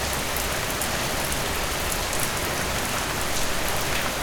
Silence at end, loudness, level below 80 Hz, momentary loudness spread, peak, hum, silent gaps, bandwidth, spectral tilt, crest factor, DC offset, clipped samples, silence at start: 0 s; -25 LUFS; -36 dBFS; 1 LU; -6 dBFS; none; none; over 20 kHz; -2.5 dB/octave; 18 dB; under 0.1%; under 0.1%; 0 s